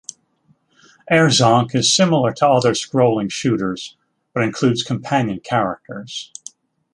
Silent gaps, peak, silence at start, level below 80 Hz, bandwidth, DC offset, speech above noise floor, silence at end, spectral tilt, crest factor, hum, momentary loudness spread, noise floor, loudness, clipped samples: none; -2 dBFS; 1.05 s; -56 dBFS; 11.5 kHz; under 0.1%; 43 dB; 0.7 s; -4.5 dB/octave; 18 dB; none; 17 LU; -60 dBFS; -17 LUFS; under 0.1%